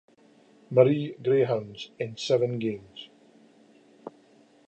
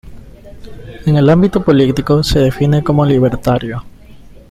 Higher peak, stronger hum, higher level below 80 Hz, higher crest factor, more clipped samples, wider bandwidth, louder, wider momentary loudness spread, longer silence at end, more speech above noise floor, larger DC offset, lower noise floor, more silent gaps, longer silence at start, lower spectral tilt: second, -6 dBFS vs 0 dBFS; neither; second, -72 dBFS vs -32 dBFS; first, 22 dB vs 12 dB; neither; second, 8.4 kHz vs 14.5 kHz; second, -26 LUFS vs -12 LUFS; first, 25 LU vs 10 LU; first, 0.6 s vs 0.15 s; first, 33 dB vs 25 dB; neither; first, -59 dBFS vs -36 dBFS; neither; first, 0.7 s vs 0.05 s; about the same, -6.5 dB/octave vs -7.5 dB/octave